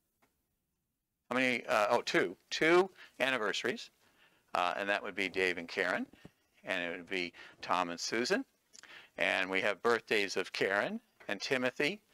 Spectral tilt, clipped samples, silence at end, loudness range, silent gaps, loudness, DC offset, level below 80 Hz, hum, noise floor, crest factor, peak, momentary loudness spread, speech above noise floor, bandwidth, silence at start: -3 dB/octave; under 0.1%; 0.15 s; 4 LU; none; -33 LUFS; under 0.1%; -78 dBFS; none; -85 dBFS; 20 dB; -16 dBFS; 12 LU; 52 dB; 16 kHz; 1.3 s